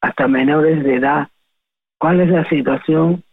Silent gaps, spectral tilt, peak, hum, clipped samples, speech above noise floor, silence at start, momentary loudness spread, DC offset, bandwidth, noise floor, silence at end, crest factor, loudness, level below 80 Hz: none; -10 dB/octave; -4 dBFS; none; under 0.1%; 63 dB; 0 s; 5 LU; under 0.1%; 4 kHz; -77 dBFS; 0.15 s; 12 dB; -15 LUFS; -52 dBFS